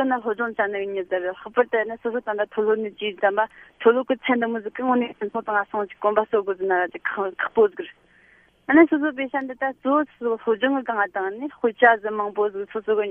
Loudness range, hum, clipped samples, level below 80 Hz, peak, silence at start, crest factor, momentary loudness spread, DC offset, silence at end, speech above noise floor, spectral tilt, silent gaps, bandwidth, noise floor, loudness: 2 LU; none; under 0.1%; -66 dBFS; -2 dBFS; 0 s; 20 dB; 10 LU; under 0.1%; 0 s; 34 dB; -7.5 dB/octave; none; 3.6 kHz; -56 dBFS; -23 LUFS